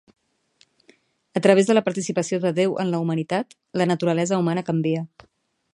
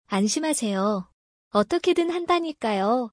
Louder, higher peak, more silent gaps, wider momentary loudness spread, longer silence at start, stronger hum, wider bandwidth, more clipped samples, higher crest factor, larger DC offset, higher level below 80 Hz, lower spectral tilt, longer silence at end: about the same, -22 LUFS vs -24 LUFS; first, -2 dBFS vs -6 dBFS; second, none vs 1.13-1.51 s; first, 10 LU vs 4 LU; first, 1.35 s vs 0.1 s; neither; about the same, 11 kHz vs 10.5 kHz; neither; about the same, 20 dB vs 18 dB; neither; second, -70 dBFS vs -62 dBFS; first, -6 dB/octave vs -4.5 dB/octave; first, 0.7 s vs 0.05 s